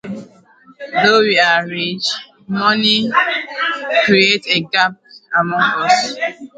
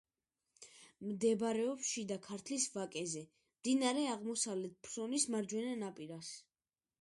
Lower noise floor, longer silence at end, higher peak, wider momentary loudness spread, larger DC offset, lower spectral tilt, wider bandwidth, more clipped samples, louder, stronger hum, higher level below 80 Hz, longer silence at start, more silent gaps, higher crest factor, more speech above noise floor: second, -47 dBFS vs under -90 dBFS; second, 0.1 s vs 0.6 s; first, 0 dBFS vs -20 dBFS; second, 11 LU vs 14 LU; neither; about the same, -3.5 dB/octave vs -3 dB/octave; second, 9.4 kHz vs 11.5 kHz; neither; first, -14 LUFS vs -39 LUFS; neither; first, -62 dBFS vs -82 dBFS; second, 0.05 s vs 0.6 s; neither; about the same, 16 dB vs 20 dB; second, 32 dB vs over 51 dB